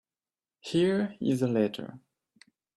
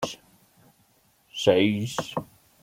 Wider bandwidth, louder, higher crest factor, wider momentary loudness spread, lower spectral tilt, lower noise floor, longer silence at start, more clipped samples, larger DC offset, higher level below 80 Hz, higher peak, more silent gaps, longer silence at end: second, 13 kHz vs 16.5 kHz; second, -28 LUFS vs -25 LUFS; second, 18 dB vs 24 dB; about the same, 17 LU vs 17 LU; first, -6.5 dB/octave vs -5 dB/octave; first, under -90 dBFS vs -64 dBFS; first, 0.65 s vs 0 s; neither; neither; about the same, -70 dBFS vs -66 dBFS; second, -14 dBFS vs -4 dBFS; neither; first, 0.8 s vs 0.4 s